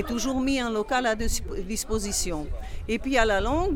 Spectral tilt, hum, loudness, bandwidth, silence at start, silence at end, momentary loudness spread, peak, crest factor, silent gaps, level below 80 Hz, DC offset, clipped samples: -3.5 dB/octave; none; -26 LUFS; 17.5 kHz; 0 s; 0 s; 8 LU; -8 dBFS; 18 dB; none; -34 dBFS; under 0.1%; under 0.1%